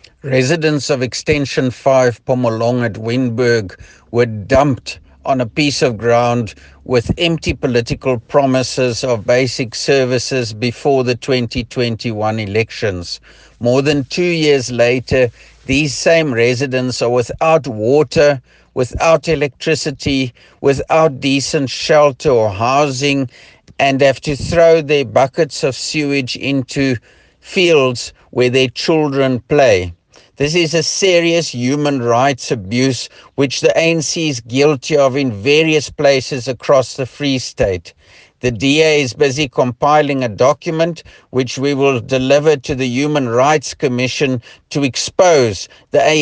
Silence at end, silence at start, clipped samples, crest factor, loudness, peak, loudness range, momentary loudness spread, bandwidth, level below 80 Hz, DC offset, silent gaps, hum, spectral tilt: 0 s; 0.25 s; under 0.1%; 14 dB; -15 LUFS; 0 dBFS; 2 LU; 8 LU; 10 kHz; -42 dBFS; under 0.1%; none; none; -5 dB/octave